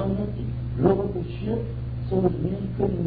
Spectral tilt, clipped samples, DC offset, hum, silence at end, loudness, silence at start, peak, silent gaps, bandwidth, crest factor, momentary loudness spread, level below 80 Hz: -12.5 dB/octave; under 0.1%; under 0.1%; none; 0 s; -26 LUFS; 0 s; -6 dBFS; none; 4.9 kHz; 20 dB; 8 LU; -38 dBFS